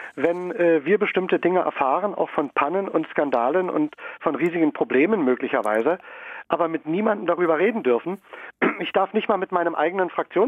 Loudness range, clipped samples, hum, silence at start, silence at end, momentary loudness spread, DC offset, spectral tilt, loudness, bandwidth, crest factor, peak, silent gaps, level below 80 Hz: 1 LU; under 0.1%; none; 0 s; 0 s; 6 LU; under 0.1%; -7.5 dB/octave; -22 LUFS; 10 kHz; 18 dB; -4 dBFS; none; -70 dBFS